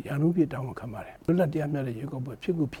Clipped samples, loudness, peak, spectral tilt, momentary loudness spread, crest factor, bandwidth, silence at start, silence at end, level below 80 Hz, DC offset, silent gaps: under 0.1%; -29 LUFS; -14 dBFS; -9 dB/octave; 11 LU; 16 dB; 16 kHz; 0 s; 0 s; -56 dBFS; under 0.1%; none